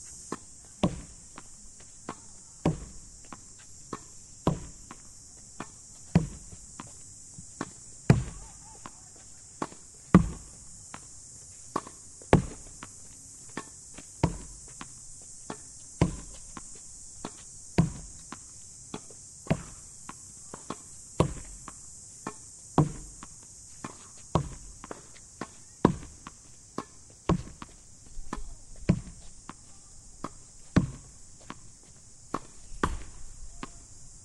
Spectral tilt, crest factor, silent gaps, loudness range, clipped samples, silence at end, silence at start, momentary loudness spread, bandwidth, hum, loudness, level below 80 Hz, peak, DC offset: -6 dB/octave; 32 dB; none; 8 LU; under 0.1%; 0 s; 0 s; 19 LU; 12 kHz; none; -34 LUFS; -46 dBFS; -2 dBFS; under 0.1%